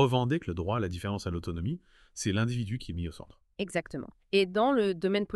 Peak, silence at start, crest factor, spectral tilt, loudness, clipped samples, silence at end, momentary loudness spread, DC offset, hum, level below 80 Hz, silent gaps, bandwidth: -10 dBFS; 0 s; 20 dB; -6 dB/octave; -31 LUFS; under 0.1%; 0 s; 15 LU; under 0.1%; none; -52 dBFS; none; 12.5 kHz